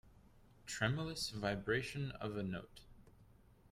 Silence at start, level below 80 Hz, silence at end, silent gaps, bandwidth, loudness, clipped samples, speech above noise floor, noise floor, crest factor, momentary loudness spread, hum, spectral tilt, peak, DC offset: 0.05 s; -62 dBFS; 0.5 s; none; 16 kHz; -41 LUFS; under 0.1%; 25 dB; -65 dBFS; 22 dB; 16 LU; none; -5 dB/octave; -22 dBFS; under 0.1%